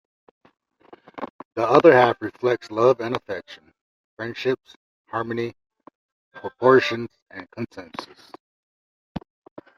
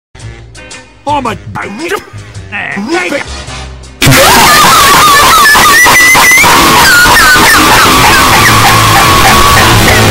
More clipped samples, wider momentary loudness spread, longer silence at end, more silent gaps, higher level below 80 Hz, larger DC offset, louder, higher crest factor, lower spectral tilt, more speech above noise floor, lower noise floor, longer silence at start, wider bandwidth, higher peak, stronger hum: second, under 0.1% vs 3%; first, 23 LU vs 16 LU; first, 0.6 s vs 0 s; first, 1.30-1.39 s, 1.45-1.51 s, 3.81-4.17 s, 4.76-5.05 s, 5.95-6.31 s, 7.22-7.26 s, 8.40-9.15 s vs none; second, -62 dBFS vs -22 dBFS; neither; second, -21 LUFS vs -2 LUFS; first, 22 dB vs 6 dB; first, -6.5 dB/octave vs -2.5 dB/octave; first, 23 dB vs 14 dB; first, -44 dBFS vs -28 dBFS; first, 1.15 s vs 0.2 s; second, 7.2 kHz vs over 20 kHz; about the same, -2 dBFS vs 0 dBFS; neither